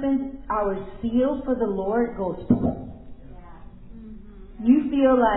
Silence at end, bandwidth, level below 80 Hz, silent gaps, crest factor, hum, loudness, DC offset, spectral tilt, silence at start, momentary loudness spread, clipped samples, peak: 0 s; 4 kHz; -42 dBFS; none; 18 dB; none; -23 LUFS; under 0.1%; -11.5 dB/octave; 0 s; 23 LU; under 0.1%; -4 dBFS